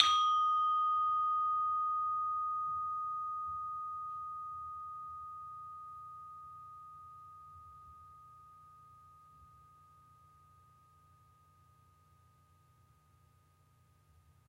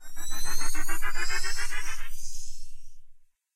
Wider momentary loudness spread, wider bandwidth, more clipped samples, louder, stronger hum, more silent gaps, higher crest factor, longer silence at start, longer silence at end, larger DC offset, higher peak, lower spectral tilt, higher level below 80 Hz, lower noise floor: first, 25 LU vs 13 LU; second, 11 kHz vs 14.5 kHz; neither; about the same, -35 LUFS vs -34 LUFS; neither; neither; first, 32 dB vs 10 dB; about the same, 0 s vs 0 s; first, 5.05 s vs 0.45 s; neither; first, -6 dBFS vs -10 dBFS; about the same, -0.5 dB/octave vs -1 dB/octave; second, -74 dBFS vs -32 dBFS; first, -68 dBFS vs -48 dBFS